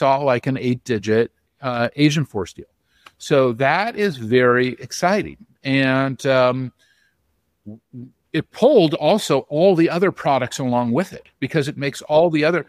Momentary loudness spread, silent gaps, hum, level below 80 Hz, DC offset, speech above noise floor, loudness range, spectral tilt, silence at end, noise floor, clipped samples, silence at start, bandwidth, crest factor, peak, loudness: 13 LU; none; none; -58 dBFS; under 0.1%; 50 dB; 4 LU; -6 dB/octave; 0.05 s; -69 dBFS; under 0.1%; 0 s; 15.5 kHz; 18 dB; -2 dBFS; -19 LUFS